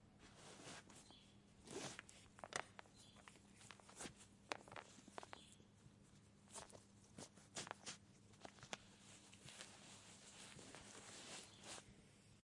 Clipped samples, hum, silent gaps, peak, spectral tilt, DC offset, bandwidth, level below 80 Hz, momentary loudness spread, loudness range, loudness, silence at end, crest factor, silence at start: under 0.1%; none; none; -22 dBFS; -2.5 dB/octave; under 0.1%; 12 kHz; -80 dBFS; 14 LU; 3 LU; -57 LUFS; 0.05 s; 38 dB; 0 s